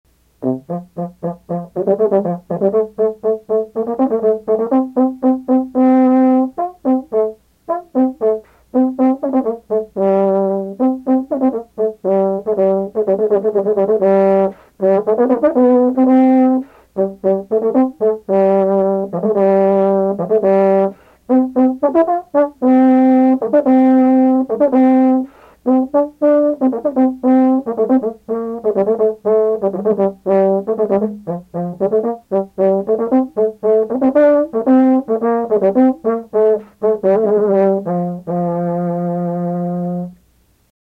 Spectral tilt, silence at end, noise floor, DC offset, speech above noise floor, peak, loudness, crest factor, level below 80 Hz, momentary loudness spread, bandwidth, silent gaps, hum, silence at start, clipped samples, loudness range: -10.5 dB/octave; 0.75 s; -55 dBFS; under 0.1%; 37 dB; -4 dBFS; -15 LUFS; 12 dB; -56 dBFS; 9 LU; 3.5 kHz; none; none; 0.4 s; under 0.1%; 4 LU